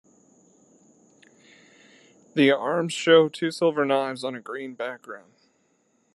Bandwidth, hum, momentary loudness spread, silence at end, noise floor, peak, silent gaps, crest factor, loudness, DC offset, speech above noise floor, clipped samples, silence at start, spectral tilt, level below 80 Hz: 12 kHz; none; 17 LU; 0.95 s; -67 dBFS; -6 dBFS; none; 20 dB; -23 LUFS; under 0.1%; 44 dB; under 0.1%; 2.35 s; -5 dB/octave; -82 dBFS